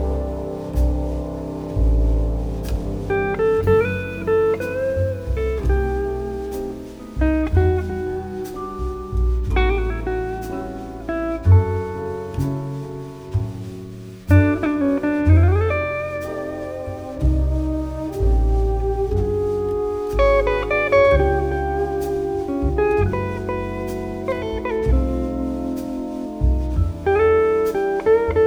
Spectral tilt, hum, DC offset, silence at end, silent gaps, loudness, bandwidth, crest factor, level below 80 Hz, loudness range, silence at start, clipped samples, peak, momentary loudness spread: -8.5 dB/octave; none; under 0.1%; 0 s; none; -21 LUFS; 15 kHz; 16 dB; -26 dBFS; 4 LU; 0 s; under 0.1%; -2 dBFS; 12 LU